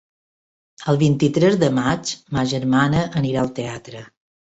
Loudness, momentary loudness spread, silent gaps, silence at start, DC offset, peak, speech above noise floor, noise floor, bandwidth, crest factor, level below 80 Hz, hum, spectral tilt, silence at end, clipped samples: -19 LUFS; 14 LU; none; 0.8 s; under 0.1%; -4 dBFS; over 71 dB; under -90 dBFS; 8.2 kHz; 16 dB; -48 dBFS; none; -6 dB/octave; 0.35 s; under 0.1%